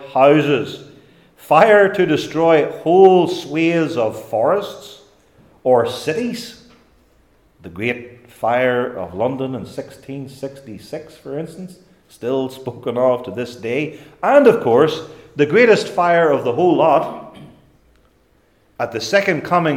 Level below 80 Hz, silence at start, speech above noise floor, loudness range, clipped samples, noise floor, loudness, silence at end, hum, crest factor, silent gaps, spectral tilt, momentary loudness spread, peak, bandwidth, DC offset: -60 dBFS; 0 s; 41 dB; 10 LU; under 0.1%; -57 dBFS; -16 LUFS; 0 s; none; 18 dB; none; -6 dB/octave; 20 LU; 0 dBFS; 16.5 kHz; under 0.1%